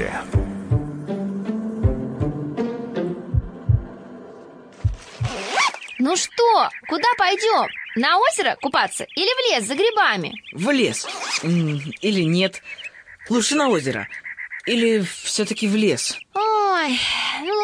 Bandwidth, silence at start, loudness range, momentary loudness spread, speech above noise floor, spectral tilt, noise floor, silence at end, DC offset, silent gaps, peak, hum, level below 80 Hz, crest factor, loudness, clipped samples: 10.5 kHz; 0 s; 6 LU; 11 LU; 22 dB; -4 dB/octave; -42 dBFS; 0 s; under 0.1%; none; -6 dBFS; none; -38 dBFS; 16 dB; -21 LUFS; under 0.1%